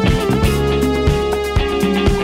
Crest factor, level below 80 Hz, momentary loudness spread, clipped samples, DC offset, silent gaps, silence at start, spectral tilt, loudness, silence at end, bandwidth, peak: 14 dB; -22 dBFS; 2 LU; under 0.1%; under 0.1%; none; 0 s; -6 dB/octave; -16 LUFS; 0 s; 16 kHz; -2 dBFS